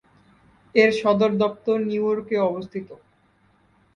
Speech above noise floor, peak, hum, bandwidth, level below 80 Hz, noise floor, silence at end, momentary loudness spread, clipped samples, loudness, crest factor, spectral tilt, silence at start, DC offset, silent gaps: 40 dB; -2 dBFS; none; 9.6 kHz; -64 dBFS; -61 dBFS; 1 s; 15 LU; under 0.1%; -21 LUFS; 20 dB; -6.5 dB/octave; 0.75 s; under 0.1%; none